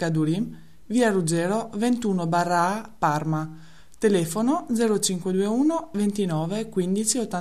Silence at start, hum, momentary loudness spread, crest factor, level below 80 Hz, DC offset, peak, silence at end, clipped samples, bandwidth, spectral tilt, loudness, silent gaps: 0 s; none; 5 LU; 16 dB; -58 dBFS; 0.6%; -8 dBFS; 0 s; under 0.1%; 14 kHz; -5 dB/octave; -24 LUFS; none